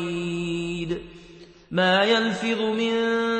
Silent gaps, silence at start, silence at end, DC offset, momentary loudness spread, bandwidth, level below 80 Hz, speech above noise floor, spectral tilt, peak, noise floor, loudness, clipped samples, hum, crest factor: none; 0 s; 0 s; under 0.1%; 11 LU; 8.8 kHz; -54 dBFS; 26 dB; -5 dB/octave; -8 dBFS; -47 dBFS; -24 LUFS; under 0.1%; none; 16 dB